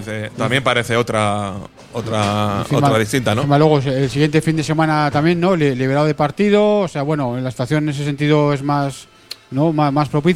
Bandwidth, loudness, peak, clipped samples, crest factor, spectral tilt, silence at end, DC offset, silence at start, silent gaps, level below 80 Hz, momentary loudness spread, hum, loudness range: 13.5 kHz; -17 LUFS; 0 dBFS; under 0.1%; 16 dB; -6.5 dB/octave; 0 s; under 0.1%; 0 s; none; -46 dBFS; 9 LU; none; 3 LU